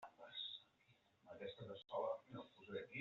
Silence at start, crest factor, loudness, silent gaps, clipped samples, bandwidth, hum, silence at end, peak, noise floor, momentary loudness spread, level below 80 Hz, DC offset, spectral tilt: 0 s; 20 dB; -51 LUFS; none; under 0.1%; 7.2 kHz; none; 0 s; -32 dBFS; -77 dBFS; 11 LU; -88 dBFS; under 0.1%; -2 dB/octave